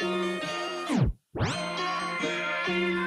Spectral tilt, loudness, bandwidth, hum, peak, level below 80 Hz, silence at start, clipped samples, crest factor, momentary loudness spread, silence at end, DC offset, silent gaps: -5 dB/octave; -29 LUFS; 13 kHz; none; -14 dBFS; -44 dBFS; 0 s; under 0.1%; 14 dB; 4 LU; 0 s; under 0.1%; none